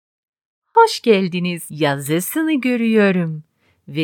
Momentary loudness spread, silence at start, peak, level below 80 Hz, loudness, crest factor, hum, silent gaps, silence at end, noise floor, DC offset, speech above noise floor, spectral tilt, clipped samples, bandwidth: 10 LU; 0.75 s; 0 dBFS; -74 dBFS; -17 LUFS; 18 dB; none; none; 0 s; -39 dBFS; under 0.1%; 23 dB; -5.5 dB/octave; under 0.1%; 19 kHz